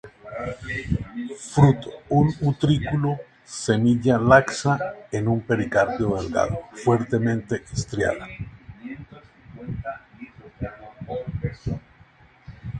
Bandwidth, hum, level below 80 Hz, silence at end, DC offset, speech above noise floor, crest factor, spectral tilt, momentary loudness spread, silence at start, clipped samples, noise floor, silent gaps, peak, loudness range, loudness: 9.6 kHz; none; -44 dBFS; 0 s; under 0.1%; 31 dB; 24 dB; -6.5 dB/octave; 20 LU; 0.05 s; under 0.1%; -53 dBFS; none; 0 dBFS; 13 LU; -23 LUFS